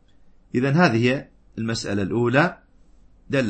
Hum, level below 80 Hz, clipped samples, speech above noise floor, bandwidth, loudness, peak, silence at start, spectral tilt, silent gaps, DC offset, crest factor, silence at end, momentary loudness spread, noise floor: none; -54 dBFS; under 0.1%; 31 dB; 8.8 kHz; -22 LUFS; -2 dBFS; 0.55 s; -6.5 dB/octave; none; under 0.1%; 20 dB; 0 s; 11 LU; -52 dBFS